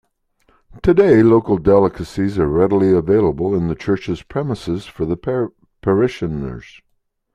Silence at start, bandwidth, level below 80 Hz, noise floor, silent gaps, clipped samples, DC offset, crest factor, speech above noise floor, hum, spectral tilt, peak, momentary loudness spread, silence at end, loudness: 0.75 s; 10 kHz; -40 dBFS; -61 dBFS; none; under 0.1%; under 0.1%; 16 dB; 45 dB; none; -8.5 dB/octave; -2 dBFS; 12 LU; 0.75 s; -17 LUFS